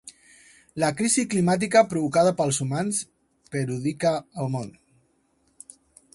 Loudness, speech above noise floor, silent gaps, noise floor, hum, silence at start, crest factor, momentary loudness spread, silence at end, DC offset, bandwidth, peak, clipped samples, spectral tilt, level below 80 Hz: -24 LUFS; 44 dB; none; -67 dBFS; none; 0.05 s; 20 dB; 13 LU; 1.45 s; under 0.1%; 11.5 kHz; -6 dBFS; under 0.1%; -5 dB/octave; -62 dBFS